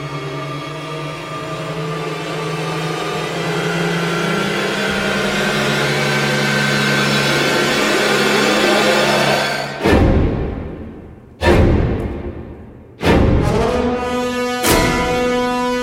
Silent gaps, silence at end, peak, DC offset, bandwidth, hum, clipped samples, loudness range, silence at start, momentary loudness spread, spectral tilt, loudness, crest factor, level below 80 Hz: none; 0 s; 0 dBFS; under 0.1%; 16.5 kHz; none; under 0.1%; 7 LU; 0 s; 12 LU; -4.5 dB/octave; -16 LUFS; 16 dB; -28 dBFS